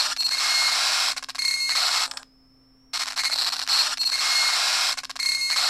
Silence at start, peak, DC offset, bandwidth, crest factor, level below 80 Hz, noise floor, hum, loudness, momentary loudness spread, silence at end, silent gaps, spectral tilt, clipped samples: 0 s; -8 dBFS; under 0.1%; 16 kHz; 16 dB; -64 dBFS; -57 dBFS; none; -21 LUFS; 6 LU; 0 s; none; 4 dB/octave; under 0.1%